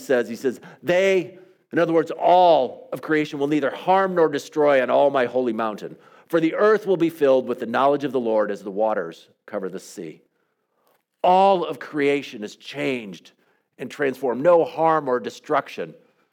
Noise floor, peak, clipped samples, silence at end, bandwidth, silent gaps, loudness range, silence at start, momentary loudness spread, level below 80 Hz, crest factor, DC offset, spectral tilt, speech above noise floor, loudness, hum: -71 dBFS; -4 dBFS; under 0.1%; 0.4 s; 16.5 kHz; none; 5 LU; 0 s; 16 LU; -78 dBFS; 16 dB; under 0.1%; -6 dB/octave; 50 dB; -21 LUFS; none